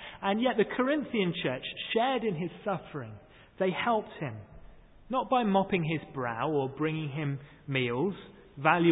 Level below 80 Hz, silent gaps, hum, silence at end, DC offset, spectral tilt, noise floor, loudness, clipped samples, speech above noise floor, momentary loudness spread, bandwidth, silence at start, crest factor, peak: -62 dBFS; none; none; 0 s; under 0.1%; -10 dB/octave; -52 dBFS; -30 LUFS; under 0.1%; 22 dB; 12 LU; 4 kHz; 0 s; 22 dB; -8 dBFS